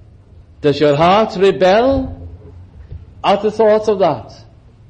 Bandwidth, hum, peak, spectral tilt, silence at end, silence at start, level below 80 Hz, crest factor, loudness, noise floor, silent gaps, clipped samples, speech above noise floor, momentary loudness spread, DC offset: 8.8 kHz; none; -2 dBFS; -6.5 dB/octave; 0.55 s; 0.6 s; -40 dBFS; 14 dB; -14 LUFS; -42 dBFS; none; under 0.1%; 29 dB; 14 LU; under 0.1%